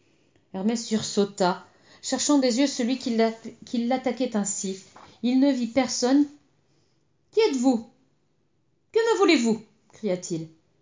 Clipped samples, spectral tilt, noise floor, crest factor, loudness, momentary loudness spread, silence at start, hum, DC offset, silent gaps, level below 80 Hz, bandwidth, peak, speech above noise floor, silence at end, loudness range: under 0.1%; -4 dB/octave; -71 dBFS; 18 dB; -25 LUFS; 12 LU; 0.55 s; none; under 0.1%; none; -70 dBFS; 7.8 kHz; -8 dBFS; 47 dB; 0.35 s; 2 LU